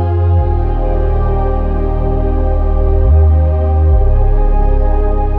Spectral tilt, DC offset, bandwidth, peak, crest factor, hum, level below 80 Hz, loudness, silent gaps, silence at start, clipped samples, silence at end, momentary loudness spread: -11.5 dB/octave; under 0.1%; 3.3 kHz; 0 dBFS; 10 dB; none; -12 dBFS; -14 LUFS; none; 0 s; under 0.1%; 0 s; 6 LU